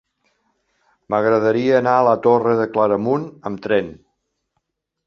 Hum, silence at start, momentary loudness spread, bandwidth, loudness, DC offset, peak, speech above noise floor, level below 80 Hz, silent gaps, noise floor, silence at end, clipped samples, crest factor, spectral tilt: none; 1.1 s; 8 LU; 6.8 kHz; -17 LUFS; under 0.1%; -2 dBFS; 57 dB; -60 dBFS; none; -74 dBFS; 1.15 s; under 0.1%; 18 dB; -8 dB/octave